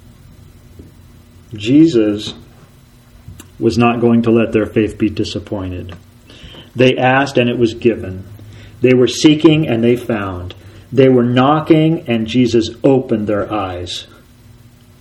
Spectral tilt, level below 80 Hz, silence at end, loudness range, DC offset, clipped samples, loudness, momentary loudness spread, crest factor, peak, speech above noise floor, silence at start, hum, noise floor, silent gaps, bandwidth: -6.5 dB/octave; -46 dBFS; 0.95 s; 4 LU; under 0.1%; under 0.1%; -14 LUFS; 16 LU; 14 dB; 0 dBFS; 31 dB; 1.5 s; none; -44 dBFS; none; 12 kHz